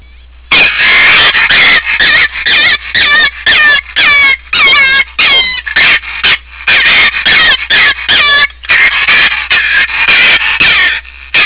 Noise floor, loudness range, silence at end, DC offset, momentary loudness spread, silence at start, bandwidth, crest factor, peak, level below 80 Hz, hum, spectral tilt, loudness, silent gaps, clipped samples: -34 dBFS; 1 LU; 0 s; under 0.1%; 5 LU; 0.5 s; 4 kHz; 6 dB; -2 dBFS; -34 dBFS; none; -4 dB/octave; -5 LUFS; none; under 0.1%